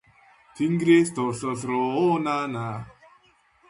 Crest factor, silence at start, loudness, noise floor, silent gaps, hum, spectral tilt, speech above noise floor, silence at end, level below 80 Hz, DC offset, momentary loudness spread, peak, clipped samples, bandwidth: 18 dB; 0.55 s; -24 LUFS; -61 dBFS; none; none; -6 dB/octave; 37 dB; 0.8 s; -64 dBFS; under 0.1%; 14 LU; -8 dBFS; under 0.1%; 11.5 kHz